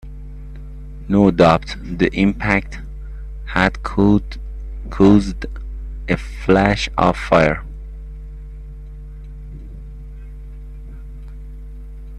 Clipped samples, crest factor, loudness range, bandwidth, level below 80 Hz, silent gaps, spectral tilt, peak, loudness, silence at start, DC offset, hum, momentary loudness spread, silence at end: under 0.1%; 20 dB; 19 LU; 9.8 kHz; -30 dBFS; none; -7 dB/octave; 0 dBFS; -16 LUFS; 0.05 s; under 0.1%; none; 23 LU; 0 s